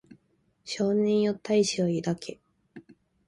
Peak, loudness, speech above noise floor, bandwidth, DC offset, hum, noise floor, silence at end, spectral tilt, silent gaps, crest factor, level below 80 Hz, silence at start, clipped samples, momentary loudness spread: -12 dBFS; -27 LUFS; 44 dB; 11.5 kHz; under 0.1%; none; -70 dBFS; 0.45 s; -5.5 dB/octave; none; 16 dB; -68 dBFS; 0.1 s; under 0.1%; 14 LU